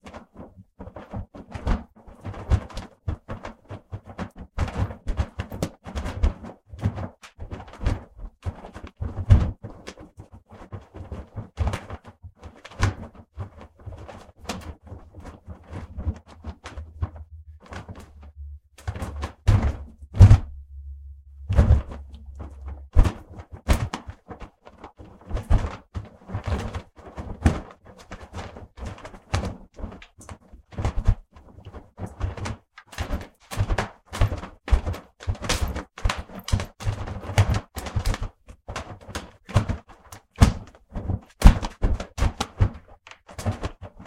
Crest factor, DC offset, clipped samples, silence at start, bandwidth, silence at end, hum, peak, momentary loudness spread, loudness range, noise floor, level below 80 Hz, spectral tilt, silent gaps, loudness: 26 dB; under 0.1%; under 0.1%; 0.05 s; 14.5 kHz; 0 s; none; 0 dBFS; 22 LU; 14 LU; -49 dBFS; -30 dBFS; -6 dB/octave; none; -27 LUFS